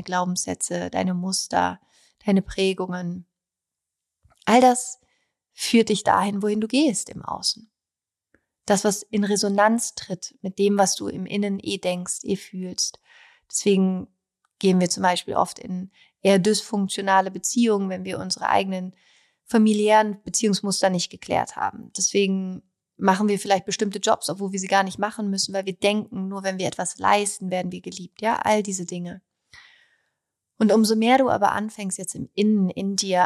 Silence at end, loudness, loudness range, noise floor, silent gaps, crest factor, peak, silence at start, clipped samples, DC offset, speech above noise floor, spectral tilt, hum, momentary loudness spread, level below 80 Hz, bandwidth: 0 s; -23 LUFS; 4 LU; -89 dBFS; none; 18 dB; -4 dBFS; 0 s; under 0.1%; under 0.1%; 67 dB; -4 dB/octave; none; 13 LU; -60 dBFS; 14 kHz